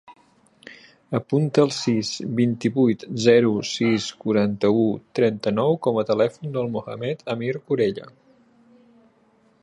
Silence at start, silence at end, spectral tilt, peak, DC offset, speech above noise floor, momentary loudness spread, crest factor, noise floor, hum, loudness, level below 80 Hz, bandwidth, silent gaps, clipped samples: 0.1 s; 1.55 s; -6 dB/octave; -4 dBFS; under 0.1%; 38 dB; 9 LU; 20 dB; -60 dBFS; none; -22 LUFS; -62 dBFS; 11 kHz; none; under 0.1%